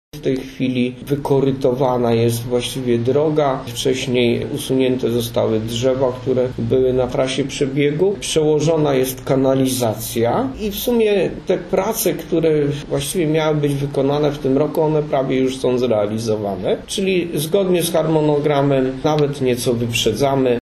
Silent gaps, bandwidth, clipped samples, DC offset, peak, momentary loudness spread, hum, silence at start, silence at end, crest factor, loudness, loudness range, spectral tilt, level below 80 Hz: none; 13.5 kHz; under 0.1%; under 0.1%; -4 dBFS; 5 LU; none; 0.15 s; 0.15 s; 14 dB; -18 LUFS; 1 LU; -5.5 dB/octave; -42 dBFS